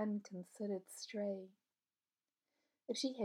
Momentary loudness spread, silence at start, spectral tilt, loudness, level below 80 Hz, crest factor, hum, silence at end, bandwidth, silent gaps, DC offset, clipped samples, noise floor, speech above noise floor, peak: 12 LU; 0 s; -4.5 dB/octave; -45 LUFS; under -90 dBFS; 16 dB; none; 0 s; 17 kHz; none; under 0.1%; under 0.1%; under -90 dBFS; over 47 dB; -28 dBFS